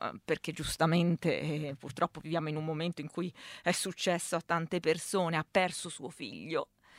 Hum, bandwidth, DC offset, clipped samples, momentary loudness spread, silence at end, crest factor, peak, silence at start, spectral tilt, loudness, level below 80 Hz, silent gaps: none; 16 kHz; under 0.1%; under 0.1%; 10 LU; 0 s; 20 dB; -14 dBFS; 0 s; -4.5 dB/octave; -33 LUFS; -62 dBFS; none